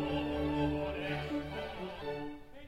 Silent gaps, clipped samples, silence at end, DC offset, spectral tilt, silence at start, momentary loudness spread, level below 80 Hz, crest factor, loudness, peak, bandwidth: none; under 0.1%; 0 s; under 0.1%; -7 dB/octave; 0 s; 8 LU; -50 dBFS; 16 dB; -37 LUFS; -20 dBFS; 13.5 kHz